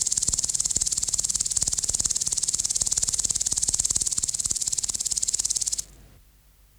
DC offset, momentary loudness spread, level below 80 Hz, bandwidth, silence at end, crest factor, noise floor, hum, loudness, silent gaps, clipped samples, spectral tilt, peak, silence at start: under 0.1%; 2 LU; -46 dBFS; over 20 kHz; 0.75 s; 20 dB; -56 dBFS; none; -23 LUFS; none; under 0.1%; 0.5 dB/octave; -6 dBFS; 0 s